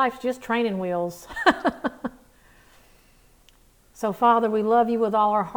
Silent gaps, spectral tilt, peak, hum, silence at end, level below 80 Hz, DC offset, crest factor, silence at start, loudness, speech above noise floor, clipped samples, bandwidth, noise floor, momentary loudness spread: none; -5.5 dB/octave; -2 dBFS; none; 0 s; -58 dBFS; under 0.1%; 22 dB; 0 s; -23 LUFS; 34 dB; under 0.1%; over 20 kHz; -57 dBFS; 11 LU